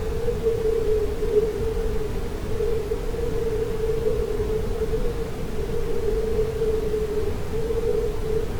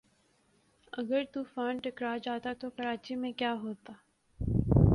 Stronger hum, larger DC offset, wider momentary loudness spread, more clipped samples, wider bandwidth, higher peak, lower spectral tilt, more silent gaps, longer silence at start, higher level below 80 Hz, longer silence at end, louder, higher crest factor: neither; neither; second, 6 LU vs 9 LU; neither; first, over 20 kHz vs 11 kHz; about the same, -8 dBFS vs -10 dBFS; second, -6.5 dB/octave vs -8.5 dB/octave; neither; second, 0 s vs 0.95 s; first, -30 dBFS vs -44 dBFS; about the same, 0 s vs 0 s; first, -26 LUFS vs -34 LUFS; second, 14 dB vs 22 dB